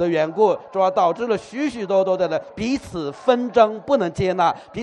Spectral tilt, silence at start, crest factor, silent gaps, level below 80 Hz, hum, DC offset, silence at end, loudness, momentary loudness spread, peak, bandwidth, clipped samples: -6 dB/octave; 0 s; 18 dB; none; -52 dBFS; none; under 0.1%; 0 s; -20 LUFS; 7 LU; -2 dBFS; 10.5 kHz; under 0.1%